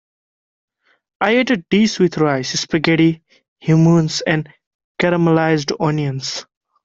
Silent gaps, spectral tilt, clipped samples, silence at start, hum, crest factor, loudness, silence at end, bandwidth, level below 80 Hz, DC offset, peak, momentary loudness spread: 3.48-3.56 s, 4.67-4.95 s; -5.5 dB/octave; under 0.1%; 1.2 s; none; 16 dB; -16 LUFS; 0.45 s; 7.8 kHz; -54 dBFS; under 0.1%; -2 dBFS; 11 LU